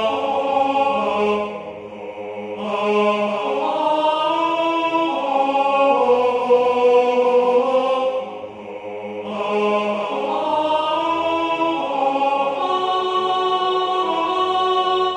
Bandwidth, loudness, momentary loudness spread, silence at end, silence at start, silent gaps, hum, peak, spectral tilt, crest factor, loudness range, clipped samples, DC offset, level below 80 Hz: 9.8 kHz; -19 LUFS; 13 LU; 0 s; 0 s; none; none; -4 dBFS; -5 dB/octave; 16 dB; 5 LU; under 0.1%; under 0.1%; -64 dBFS